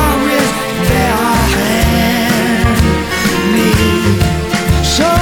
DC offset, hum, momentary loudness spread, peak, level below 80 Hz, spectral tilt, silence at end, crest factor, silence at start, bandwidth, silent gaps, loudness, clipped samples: under 0.1%; none; 3 LU; 0 dBFS; -22 dBFS; -5 dB/octave; 0 s; 10 dB; 0 s; over 20 kHz; none; -12 LUFS; under 0.1%